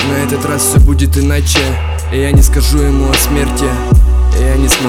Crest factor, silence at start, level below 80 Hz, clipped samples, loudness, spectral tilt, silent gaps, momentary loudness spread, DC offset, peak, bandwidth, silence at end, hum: 10 dB; 0 s; -12 dBFS; 0.7%; -11 LUFS; -4.5 dB/octave; none; 5 LU; under 0.1%; 0 dBFS; 16.5 kHz; 0 s; none